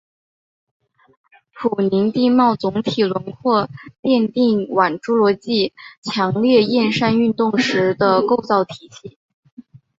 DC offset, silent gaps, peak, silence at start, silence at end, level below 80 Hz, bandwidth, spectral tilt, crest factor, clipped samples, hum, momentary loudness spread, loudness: under 0.1%; 3.99-4.03 s, 5.97-6.02 s, 9.16-9.43 s, 9.52-9.57 s; -2 dBFS; 1.55 s; 0.4 s; -58 dBFS; 7.8 kHz; -6 dB/octave; 16 dB; under 0.1%; none; 9 LU; -17 LUFS